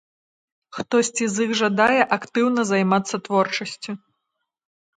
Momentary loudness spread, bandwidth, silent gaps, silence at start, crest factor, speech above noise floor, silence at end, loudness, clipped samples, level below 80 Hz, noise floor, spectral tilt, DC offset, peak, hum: 16 LU; 9.6 kHz; none; 0.75 s; 20 dB; 58 dB; 1 s; -21 LUFS; under 0.1%; -66 dBFS; -79 dBFS; -4 dB/octave; under 0.1%; -2 dBFS; none